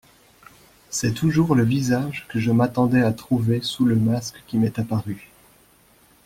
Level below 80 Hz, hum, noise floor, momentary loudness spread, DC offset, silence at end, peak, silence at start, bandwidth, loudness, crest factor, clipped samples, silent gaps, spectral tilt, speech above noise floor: -52 dBFS; none; -56 dBFS; 8 LU; under 0.1%; 1.1 s; -6 dBFS; 0.9 s; 16 kHz; -22 LUFS; 16 dB; under 0.1%; none; -6 dB/octave; 35 dB